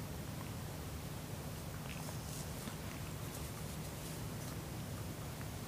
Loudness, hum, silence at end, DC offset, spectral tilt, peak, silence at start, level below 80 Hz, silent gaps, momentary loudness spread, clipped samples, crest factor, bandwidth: -45 LUFS; none; 0 s; under 0.1%; -4.5 dB/octave; -30 dBFS; 0 s; -54 dBFS; none; 1 LU; under 0.1%; 14 dB; 15.5 kHz